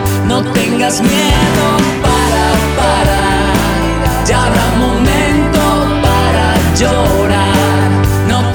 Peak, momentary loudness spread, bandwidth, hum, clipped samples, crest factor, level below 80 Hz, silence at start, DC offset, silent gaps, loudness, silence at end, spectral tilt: 0 dBFS; 2 LU; over 20 kHz; none; under 0.1%; 10 dB; -20 dBFS; 0 s; under 0.1%; none; -11 LUFS; 0 s; -5 dB/octave